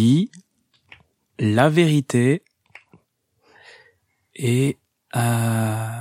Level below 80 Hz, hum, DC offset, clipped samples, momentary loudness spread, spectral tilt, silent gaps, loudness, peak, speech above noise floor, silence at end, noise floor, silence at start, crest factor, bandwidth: -62 dBFS; none; under 0.1%; under 0.1%; 11 LU; -6.5 dB/octave; none; -20 LUFS; -4 dBFS; 48 dB; 0 s; -67 dBFS; 0 s; 18 dB; 15.5 kHz